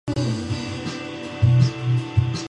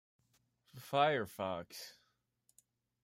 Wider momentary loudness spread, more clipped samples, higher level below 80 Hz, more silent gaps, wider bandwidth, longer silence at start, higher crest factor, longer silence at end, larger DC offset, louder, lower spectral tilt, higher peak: second, 12 LU vs 20 LU; neither; first, -38 dBFS vs -80 dBFS; neither; second, 9.4 kHz vs 16 kHz; second, 0.05 s vs 0.75 s; second, 16 dB vs 24 dB; second, 0.05 s vs 1.1 s; neither; first, -23 LUFS vs -36 LUFS; first, -6.5 dB/octave vs -4.5 dB/octave; first, -6 dBFS vs -18 dBFS